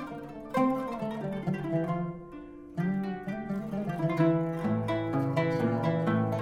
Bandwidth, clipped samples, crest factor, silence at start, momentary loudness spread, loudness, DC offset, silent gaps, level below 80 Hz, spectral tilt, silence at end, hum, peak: 13 kHz; under 0.1%; 16 dB; 0 s; 11 LU; -30 LUFS; under 0.1%; none; -58 dBFS; -8.5 dB/octave; 0 s; none; -14 dBFS